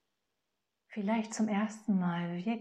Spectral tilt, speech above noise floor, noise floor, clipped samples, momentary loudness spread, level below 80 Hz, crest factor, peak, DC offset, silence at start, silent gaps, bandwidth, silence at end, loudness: -6 dB/octave; 53 dB; -86 dBFS; under 0.1%; 5 LU; -80 dBFS; 14 dB; -20 dBFS; under 0.1%; 0.9 s; none; 10 kHz; 0 s; -34 LUFS